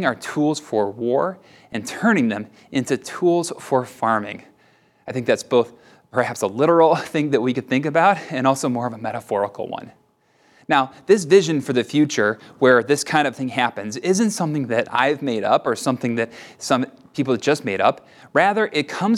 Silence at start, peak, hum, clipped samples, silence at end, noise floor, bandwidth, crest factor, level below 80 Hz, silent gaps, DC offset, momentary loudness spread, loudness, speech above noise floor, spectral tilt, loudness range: 0 s; -2 dBFS; none; under 0.1%; 0 s; -60 dBFS; 15 kHz; 18 dB; -68 dBFS; none; under 0.1%; 11 LU; -20 LUFS; 40 dB; -5 dB/octave; 4 LU